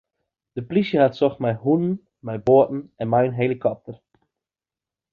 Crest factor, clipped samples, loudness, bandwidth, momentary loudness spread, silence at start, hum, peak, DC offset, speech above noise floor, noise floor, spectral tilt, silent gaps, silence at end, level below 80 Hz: 18 dB; under 0.1%; -21 LUFS; 6.6 kHz; 16 LU; 0.55 s; none; -4 dBFS; under 0.1%; over 70 dB; under -90 dBFS; -9.5 dB/octave; none; 1.2 s; -58 dBFS